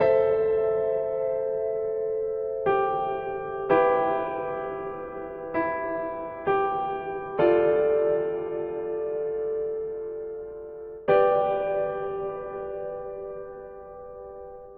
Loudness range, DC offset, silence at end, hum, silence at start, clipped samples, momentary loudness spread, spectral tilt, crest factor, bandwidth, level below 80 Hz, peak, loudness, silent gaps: 4 LU; under 0.1%; 0 s; none; 0 s; under 0.1%; 16 LU; -9.5 dB/octave; 18 dB; 4.7 kHz; -58 dBFS; -8 dBFS; -27 LUFS; none